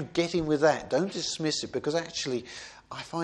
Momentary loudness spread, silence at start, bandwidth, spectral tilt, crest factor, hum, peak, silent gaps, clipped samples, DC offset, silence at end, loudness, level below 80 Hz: 17 LU; 0 s; 11 kHz; -4 dB/octave; 20 dB; none; -10 dBFS; none; under 0.1%; under 0.1%; 0 s; -29 LUFS; -58 dBFS